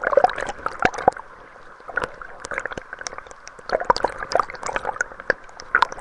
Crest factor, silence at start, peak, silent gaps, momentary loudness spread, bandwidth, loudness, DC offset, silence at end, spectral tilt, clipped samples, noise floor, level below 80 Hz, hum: 24 dB; 0 s; 0 dBFS; none; 18 LU; 11.5 kHz; -24 LUFS; under 0.1%; 0 s; -3 dB/octave; under 0.1%; -43 dBFS; -48 dBFS; none